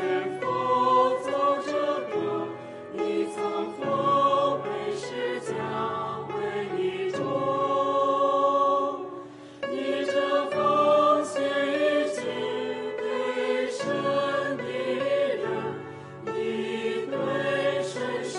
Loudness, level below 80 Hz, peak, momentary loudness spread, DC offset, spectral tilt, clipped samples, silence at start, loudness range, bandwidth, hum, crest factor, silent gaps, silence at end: -26 LUFS; -70 dBFS; -10 dBFS; 9 LU; under 0.1%; -5 dB/octave; under 0.1%; 0 s; 4 LU; 11.5 kHz; none; 16 dB; none; 0 s